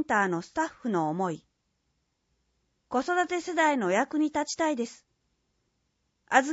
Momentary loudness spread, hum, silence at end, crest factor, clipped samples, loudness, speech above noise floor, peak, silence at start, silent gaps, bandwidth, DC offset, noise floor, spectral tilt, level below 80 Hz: 8 LU; none; 0 s; 24 dB; under 0.1%; -28 LUFS; 49 dB; -6 dBFS; 0 s; none; 8 kHz; under 0.1%; -77 dBFS; -4.5 dB/octave; -70 dBFS